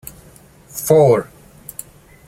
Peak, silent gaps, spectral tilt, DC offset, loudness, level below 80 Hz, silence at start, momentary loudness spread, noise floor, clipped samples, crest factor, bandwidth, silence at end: -2 dBFS; none; -6 dB/octave; under 0.1%; -14 LUFS; -52 dBFS; 0.75 s; 25 LU; -46 dBFS; under 0.1%; 18 dB; 16.5 kHz; 1.05 s